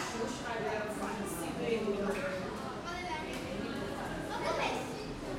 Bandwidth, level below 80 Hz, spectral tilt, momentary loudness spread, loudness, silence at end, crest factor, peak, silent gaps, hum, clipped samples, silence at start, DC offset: 16 kHz; -54 dBFS; -4.5 dB/octave; 6 LU; -37 LUFS; 0 s; 18 dB; -20 dBFS; none; none; under 0.1%; 0 s; under 0.1%